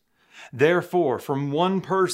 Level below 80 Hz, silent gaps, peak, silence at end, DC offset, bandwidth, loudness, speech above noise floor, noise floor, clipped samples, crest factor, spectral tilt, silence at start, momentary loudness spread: -72 dBFS; none; -6 dBFS; 0 s; under 0.1%; 16 kHz; -23 LUFS; 27 dB; -49 dBFS; under 0.1%; 18 dB; -6 dB/octave; 0.35 s; 6 LU